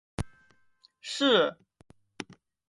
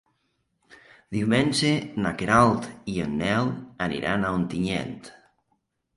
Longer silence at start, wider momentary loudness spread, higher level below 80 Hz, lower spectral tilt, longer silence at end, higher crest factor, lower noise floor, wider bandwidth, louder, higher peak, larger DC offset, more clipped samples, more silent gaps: second, 0.2 s vs 1.1 s; first, 21 LU vs 11 LU; about the same, -54 dBFS vs -50 dBFS; second, -4 dB/octave vs -5.5 dB/octave; second, 0.45 s vs 0.85 s; about the same, 22 dB vs 20 dB; second, -65 dBFS vs -74 dBFS; about the same, 11.5 kHz vs 11.5 kHz; about the same, -27 LUFS vs -25 LUFS; second, -10 dBFS vs -6 dBFS; neither; neither; neither